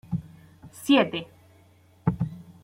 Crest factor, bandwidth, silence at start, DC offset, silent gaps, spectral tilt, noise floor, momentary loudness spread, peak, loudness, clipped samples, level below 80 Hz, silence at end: 20 dB; 16 kHz; 0.1 s; under 0.1%; none; -6 dB/octave; -57 dBFS; 19 LU; -8 dBFS; -26 LUFS; under 0.1%; -54 dBFS; 0.2 s